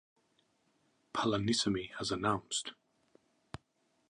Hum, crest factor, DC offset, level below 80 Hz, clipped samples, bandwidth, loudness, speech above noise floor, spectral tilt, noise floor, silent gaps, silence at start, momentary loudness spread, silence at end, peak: none; 20 dB; under 0.1%; -64 dBFS; under 0.1%; 11 kHz; -34 LUFS; 42 dB; -4 dB/octave; -77 dBFS; none; 1.15 s; 21 LU; 1.4 s; -18 dBFS